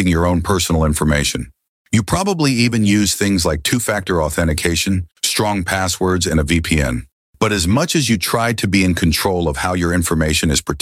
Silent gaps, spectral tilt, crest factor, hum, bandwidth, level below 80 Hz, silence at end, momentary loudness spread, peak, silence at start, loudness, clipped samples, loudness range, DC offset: 1.69-1.85 s, 7.12-7.33 s; -4.5 dB/octave; 14 dB; none; 16.5 kHz; -30 dBFS; 0 s; 4 LU; -2 dBFS; 0 s; -16 LUFS; under 0.1%; 1 LU; under 0.1%